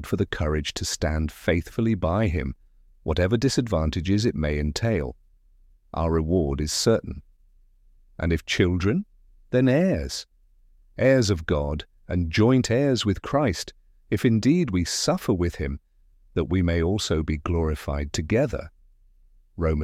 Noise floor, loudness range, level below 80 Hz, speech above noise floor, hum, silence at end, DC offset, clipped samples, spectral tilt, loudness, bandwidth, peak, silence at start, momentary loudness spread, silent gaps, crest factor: -57 dBFS; 3 LU; -36 dBFS; 34 dB; none; 0 s; under 0.1%; under 0.1%; -5.5 dB/octave; -24 LUFS; 15.5 kHz; -8 dBFS; 0 s; 12 LU; none; 18 dB